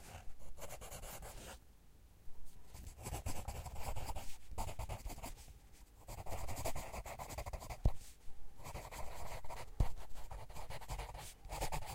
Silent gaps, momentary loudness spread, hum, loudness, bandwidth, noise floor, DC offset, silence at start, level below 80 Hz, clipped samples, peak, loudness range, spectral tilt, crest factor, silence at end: none; 18 LU; none; -48 LUFS; 16 kHz; -61 dBFS; under 0.1%; 0 s; -48 dBFS; under 0.1%; -18 dBFS; 4 LU; -4.5 dB/octave; 24 dB; 0 s